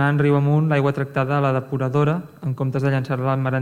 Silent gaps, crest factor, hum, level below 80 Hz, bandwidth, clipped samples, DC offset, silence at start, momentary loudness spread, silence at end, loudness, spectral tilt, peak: none; 12 dB; none; -58 dBFS; 7 kHz; under 0.1%; under 0.1%; 0 s; 6 LU; 0 s; -21 LUFS; -9 dB/octave; -6 dBFS